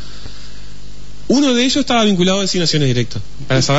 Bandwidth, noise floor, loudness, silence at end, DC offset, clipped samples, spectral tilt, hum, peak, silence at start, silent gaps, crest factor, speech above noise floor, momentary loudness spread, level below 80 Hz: 8 kHz; -36 dBFS; -15 LUFS; 0 s; 8%; under 0.1%; -4.5 dB/octave; none; -2 dBFS; 0 s; none; 12 dB; 21 dB; 22 LU; -38 dBFS